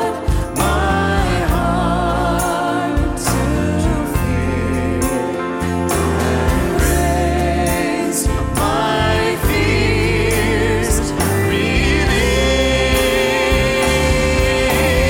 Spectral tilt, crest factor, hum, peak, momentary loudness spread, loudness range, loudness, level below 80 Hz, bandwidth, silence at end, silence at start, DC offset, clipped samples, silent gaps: -5 dB/octave; 12 dB; none; -4 dBFS; 4 LU; 3 LU; -16 LUFS; -22 dBFS; 17 kHz; 0 s; 0 s; under 0.1%; under 0.1%; none